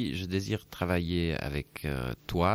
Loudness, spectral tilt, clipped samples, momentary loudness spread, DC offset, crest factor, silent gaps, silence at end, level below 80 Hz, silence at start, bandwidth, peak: -32 LUFS; -6.5 dB/octave; under 0.1%; 6 LU; under 0.1%; 18 dB; none; 0 s; -44 dBFS; 0 s; 16.5 kHz; -12 dBFS